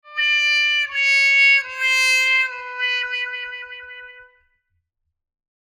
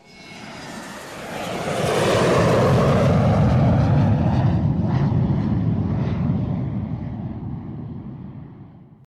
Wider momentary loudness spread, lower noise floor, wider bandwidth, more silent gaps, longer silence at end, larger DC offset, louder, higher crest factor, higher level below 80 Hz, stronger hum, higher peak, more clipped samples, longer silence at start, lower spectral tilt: about the same, 18 LU vs 18 LU; first, -75 dBFS vs -43 dBFS; first, 17.5 kHz vs 13.5 kHz; neither; first, 1.45 s vs 0.3 s; neither; first, -16 LUFS vs -20 LUFS; about the same, 16 dB vs 12 dB; second, -70 dBFS vs -36 dBFS; neither; about the same, -6 dBFS vs -8 dBFS; neither; about the same, 0.05 s vs 0.15 s; second, 5.5 dB/octave vs -7 dB/octave